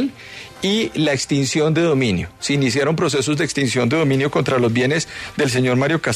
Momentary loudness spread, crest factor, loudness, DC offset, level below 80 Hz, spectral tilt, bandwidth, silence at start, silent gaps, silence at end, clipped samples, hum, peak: 5 LU; 14 dB; -18 LUFS; under 0.1%; -50 dBFS; -5 dB/octave; 13.5 kHz; 0 s; none; 0 s; under 0.1%; none; -6 dBFS